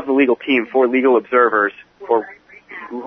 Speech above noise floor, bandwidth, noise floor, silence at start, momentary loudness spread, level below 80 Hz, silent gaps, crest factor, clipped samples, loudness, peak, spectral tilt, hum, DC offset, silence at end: 21 dB; 5.2 kHz; -37 dBFS; 0 s; 21 LU; -66 dBFS; none; 16 dB; under 0.1%; -16 LUFS; -2 dBFS; -7 dB/octave; none; under 0.1%; 0 s